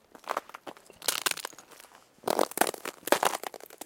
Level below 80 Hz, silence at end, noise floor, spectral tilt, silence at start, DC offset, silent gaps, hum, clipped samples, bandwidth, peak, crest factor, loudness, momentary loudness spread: -76 dBFS; 0.1 s; -55 dBFS; -1 dB/octave; 0.25 s; under 0.1%; none; none; under 0.1%; 17 kHz; -4 dBFS; 30 dB; -30 LUFS; 20 LU